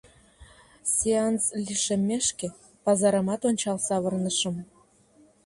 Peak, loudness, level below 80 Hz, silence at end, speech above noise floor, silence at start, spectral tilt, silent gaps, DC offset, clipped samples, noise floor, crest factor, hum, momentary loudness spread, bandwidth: -10 dBFS; -26 LUFS; -60 dBFS; 0.8 s; 33 dB; 0.4 s; -4 dB/octave; none; under 0.1%; under 0.1%; -59 dBFS; 16 dB; none; 8 LU; 11.5 kHz